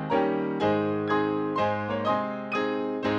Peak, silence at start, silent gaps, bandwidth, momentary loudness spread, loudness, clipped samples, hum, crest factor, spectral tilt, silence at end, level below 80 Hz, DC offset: -12 dBFS; 0 s; none; 7.4 kHz; 3 LU; -27 LUFS; under 0.1%; none; 14 dB; -7.5 dB/octave; 0 s; -62 dBFS; under 0.1%